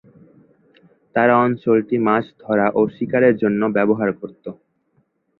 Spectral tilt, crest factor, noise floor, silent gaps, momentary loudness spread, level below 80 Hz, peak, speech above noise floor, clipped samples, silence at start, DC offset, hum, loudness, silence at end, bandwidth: -10.5 dB/octave; 18 dB; -65 dBFS; none; 12 LU; -60 dBFS; -2 dBFS; 47 dB; under 0.1%; 1.15 s; under 0.1%; none; -18 LUFS; 0.85 s; 4.2 kHz